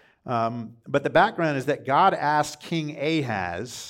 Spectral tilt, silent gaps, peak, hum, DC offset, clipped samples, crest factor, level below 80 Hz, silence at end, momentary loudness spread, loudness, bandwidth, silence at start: -5.5 dB/octave; none; -6 dBFS; none; under 0.1%; under 0.1%; 18 dB; -62 dBFS; 0 s; 9 LU; -24 LUFS; 16.5 kHz; 0.25 s